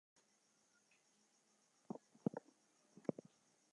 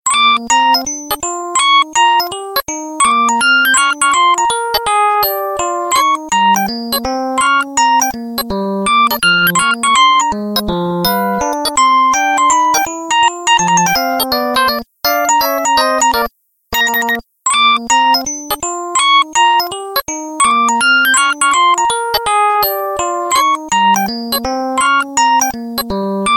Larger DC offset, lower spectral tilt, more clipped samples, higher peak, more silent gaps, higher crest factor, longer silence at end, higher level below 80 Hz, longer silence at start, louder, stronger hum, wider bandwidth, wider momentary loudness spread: neither; first, -7.5 dB/octave vs -1.5 dB/octave; neither; second, -24 dBFS vs -2 dBFS; neither; first, 30 dB vs 12 dB; first, 1.35 s vs 0 s; second, under -90 dBFS vs -42 dBFS; first, 1.9 s vs 0.05 s; second, -50 LUFS vs -12 LUFS; neither; second, 11 kHz vs 17 kHz; about the same, 9 LU vs 8 LU